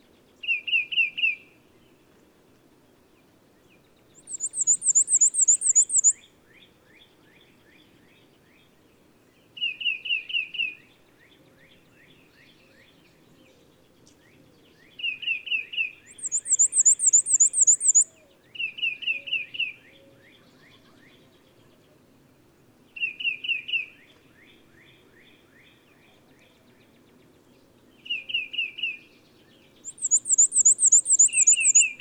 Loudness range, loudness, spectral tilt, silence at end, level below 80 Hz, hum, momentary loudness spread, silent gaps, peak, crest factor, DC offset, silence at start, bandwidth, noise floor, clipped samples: 16 LU; -20 LUFS; 3.5 dB/octave; 0.05 s; -74 dBFS; none; 16 LU; none; -8 dBFS; 20 dB; under 0.1%; 0.45 s; over 20 kHz; -59 dBFS; under 0.1%